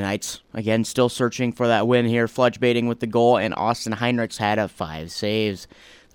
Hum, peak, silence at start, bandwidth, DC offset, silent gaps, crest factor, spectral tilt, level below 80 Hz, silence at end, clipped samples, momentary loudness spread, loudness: none; -6 dBFS; 0 s; 17 kHz; under 0.1%; none; 16 dB; -5 dB/octave; -56 dBFS; 0.5 s; under 0.1%; 9 LU; -22 LUFS